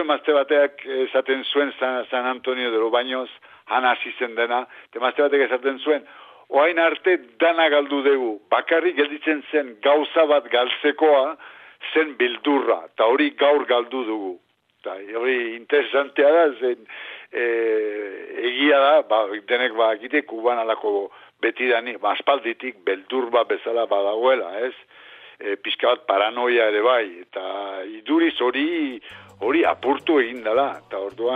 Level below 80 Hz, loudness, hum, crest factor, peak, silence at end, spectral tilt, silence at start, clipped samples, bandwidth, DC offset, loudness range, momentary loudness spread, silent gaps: -76 dBFS; -21 LUFS; none; 16 dB; -4 dBFS; 0 s; -5 dB/octave; 0 s; under 0.1%; 4.7 kHz; under 0.1%; 3 LU; 12 LU; none